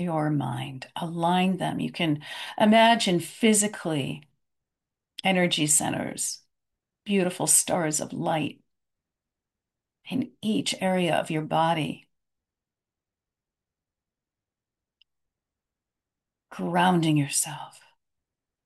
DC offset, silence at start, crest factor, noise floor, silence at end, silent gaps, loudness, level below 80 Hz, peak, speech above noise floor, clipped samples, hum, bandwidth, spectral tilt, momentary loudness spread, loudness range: under 0.1%; 0 s; 22 dB; -90 dBFS; 0.95 s; none; -25 LUFS; -70 dBFS; -6 dBFS; 65 dB; under 0.1%; none; 12.5 kHz; -3.5 dB/octave; 15 LU; 7 LU